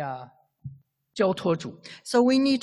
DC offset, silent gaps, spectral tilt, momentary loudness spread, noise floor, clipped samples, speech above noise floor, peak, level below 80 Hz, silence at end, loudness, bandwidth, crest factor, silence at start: under 0.1%; none; -5.5 dB/octave; 24 LU; -48 dBFS; under 0.1%; 25 dB; -8 dBFS; -66 dBFS; 0 s; -24 LUFS; 12 kHz; 18 dB; 0 s